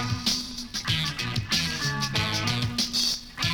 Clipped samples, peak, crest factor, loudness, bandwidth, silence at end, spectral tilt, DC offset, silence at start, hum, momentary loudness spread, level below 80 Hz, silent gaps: under 0.1%; -12 dBFS; 16 dB; -26 LUFS; over 20 kHz; 0 s; -3 dB/octave; under 0.1%; 0 s; none; 5 LU; -46 dBFS; none